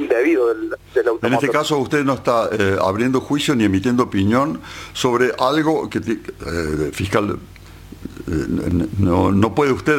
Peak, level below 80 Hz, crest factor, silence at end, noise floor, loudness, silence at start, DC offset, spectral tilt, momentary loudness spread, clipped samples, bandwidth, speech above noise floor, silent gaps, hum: -2 dBFS; -42 dBFS; 18 dB; 0 s; -39 dBFS; -18 LUFS; 0 s; under 0.1%; -6 dB/octave; 9 LU; under 0.1%; 17 kHz; 21 dB; none; 50 Hz at -45 dBFS